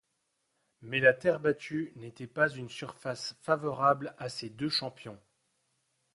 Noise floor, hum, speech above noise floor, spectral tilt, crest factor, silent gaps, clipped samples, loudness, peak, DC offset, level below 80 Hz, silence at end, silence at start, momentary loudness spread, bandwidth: -79 dBFS; none; 48 dB; -5 dB/octave; 24 dB; none; under 0.1%; -31 LUFS; -10 dBFS; under 0.1%; -72 dBFS; 1 s; 0.8 s; 16 LU; 11.5 kHz